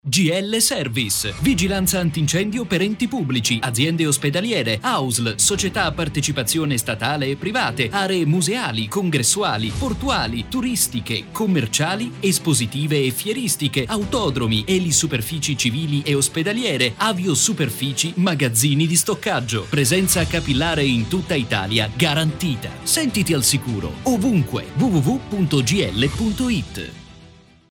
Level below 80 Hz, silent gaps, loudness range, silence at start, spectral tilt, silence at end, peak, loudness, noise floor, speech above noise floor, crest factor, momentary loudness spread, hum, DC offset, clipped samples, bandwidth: -42 dBFS; none; 2 LU; 0.05 s; -4 dB/octave; 0.4 s; -2 dBFS; -19 LUFS; -47 dBFS; 27 dB; 18 dB; 5 LU; none; under 0.1%; under 0.1%; 20 kHz